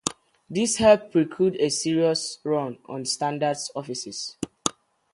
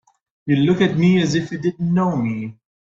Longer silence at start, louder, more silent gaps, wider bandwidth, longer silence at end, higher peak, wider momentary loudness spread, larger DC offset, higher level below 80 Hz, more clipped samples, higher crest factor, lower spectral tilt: second, 0.05 s vs 0.45 s; second, -24 LUFS vs -19 LUFS; neither; first, 11.5 kHz vs 7.6 kHz; about the same, 0.45 s vs 0.35 s; about the same, -2 dBFS vs -2 dBFS; about the same, 13 LU vs 12 LU; neither; about the same, -58 dBFS vs -54 dBFS; neither; first, 22 dB vs 16 dB; second, -4 dB/octave vs -7 dB/octave